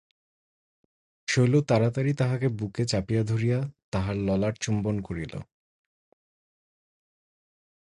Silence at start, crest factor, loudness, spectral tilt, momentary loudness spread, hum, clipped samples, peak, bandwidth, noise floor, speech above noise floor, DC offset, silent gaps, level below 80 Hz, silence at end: 1.3 s; 18 dB; -27 LUFS; -6.5 dB/octave; 11 LU; none; under 0.1%; -10 dBFS; 11 kHz; under -90 dBFS; over 65 dB; under 0.1%; 3.84-3.92 s; -50 dBFS; 2.45 s